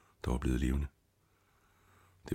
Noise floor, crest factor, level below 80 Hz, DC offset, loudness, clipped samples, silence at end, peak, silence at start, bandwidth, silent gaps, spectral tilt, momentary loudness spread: -72 dBFS; 20 dB; -40 dBFS; under 0.1%; -36 LUFS; under 0.1%; 0 s; -18 dBFS; 0.25 s; 13.5 kHz; none; -7 dB/octave; 13 LU